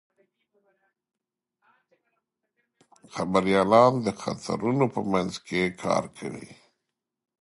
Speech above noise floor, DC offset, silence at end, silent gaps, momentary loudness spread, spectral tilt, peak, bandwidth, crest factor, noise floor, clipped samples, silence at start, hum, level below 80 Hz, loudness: 59 dB; under 0.1%; 0.9 s; none; 18 LU; -6 dB/octave; -4 dBFS; 11.5 kHz; 24 dB; -84 dBFS; under 0.1%; 3.15 s; none; -60 dBFS; -24 LUFS